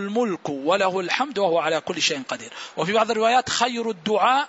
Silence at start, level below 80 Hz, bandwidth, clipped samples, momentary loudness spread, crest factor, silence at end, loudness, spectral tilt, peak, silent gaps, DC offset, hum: 0 s; -66 dBFS; 8 kHz; under 0.1%; 8 LU; 18 dB; 0 s; -22 LUFS; -3 dB/octave; -4 dBFS; none; under 0.1%; none